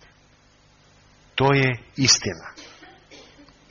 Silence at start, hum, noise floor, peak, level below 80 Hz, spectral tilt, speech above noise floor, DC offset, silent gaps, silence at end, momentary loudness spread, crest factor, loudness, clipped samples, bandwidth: 1.35 s; 50 Hz at -55 dBFS; -56 dBFS; -4 dBFS; -54 dBFS; -3 dB/octave; 36 dB; under 0.1%; none; 0.55 s; 22 LU; 22 dB; -20 LUFS; under 0.1%; 7.2 kHz